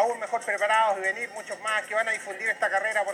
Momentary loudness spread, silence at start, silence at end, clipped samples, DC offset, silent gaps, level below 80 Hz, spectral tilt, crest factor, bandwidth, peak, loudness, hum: 8 LU; 0 s; 0 s; under 0.1%; under 0.1%; none; -90 dBFS; -1 dB/octave; 14 dB; 16 kHz; -12 dBFS; -26 LUFS; none